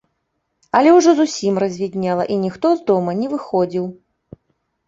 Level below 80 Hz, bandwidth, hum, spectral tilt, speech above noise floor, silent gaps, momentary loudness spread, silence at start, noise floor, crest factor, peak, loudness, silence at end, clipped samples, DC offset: -60 dBFS; 7.8 kHz; none; -6 dB/octave; 56 dB; none; 10 LU; 0.75 s; -72 dBFS; 16 dB; -2 dBFS; -17 LUFS; 0.95 s; under 0.1%; under 0.1%